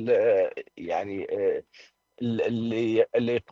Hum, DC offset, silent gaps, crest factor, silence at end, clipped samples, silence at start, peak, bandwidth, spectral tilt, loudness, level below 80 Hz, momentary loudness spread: none; under 0.1%; none; 16 dB; 0.1 s; under 0.1%; 0 s; -10 dBFS; 7.4 kHz; -7.5 dB/octave; -27 LUFS; -68 dBFS; 10 LU